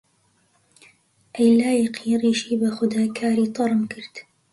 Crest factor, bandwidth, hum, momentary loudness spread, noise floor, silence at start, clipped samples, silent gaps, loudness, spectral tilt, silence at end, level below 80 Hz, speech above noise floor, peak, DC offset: 16 dB; 11.5 kHz; none; 17 LU; -64 dBFS; 1.35 s; under 0.1%; none; -21 LUFS; -5.5 dB/octave; 0.3 s; -64 dBFS; 44 dB; -6 dBFS; under 0.1%